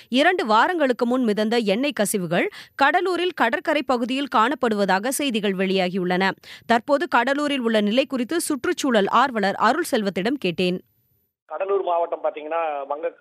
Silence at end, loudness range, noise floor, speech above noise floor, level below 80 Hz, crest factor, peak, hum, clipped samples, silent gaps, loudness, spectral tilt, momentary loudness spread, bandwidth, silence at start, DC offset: 0.1 s; 3 LU; -67 dBFS; 46 dB; -68 dBFS; 16 dB; -6 dBFS; none; under 0.1%; 11.42-11.46 s; -21 LUFS; -4.5 dB/octave; 7 LU; 15.5 kHz; 0.1 s; under 0.1%